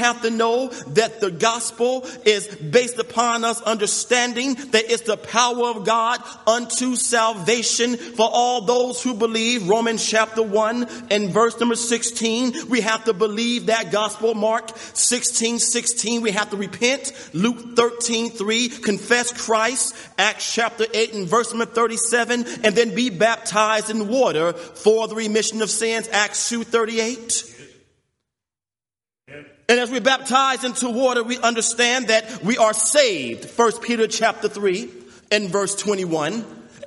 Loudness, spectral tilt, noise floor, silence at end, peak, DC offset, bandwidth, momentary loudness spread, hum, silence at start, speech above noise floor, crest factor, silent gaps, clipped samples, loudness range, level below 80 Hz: -20 LUFS; -2 dB/octave; under -90 dBFS; 0 s; -2 dBFS; under 0.1%; 11.5 kHz; 5 LU; none; 0 s; over 70 dB; 18 dB; none; under 0.1%; 3 LU; -68 dBFS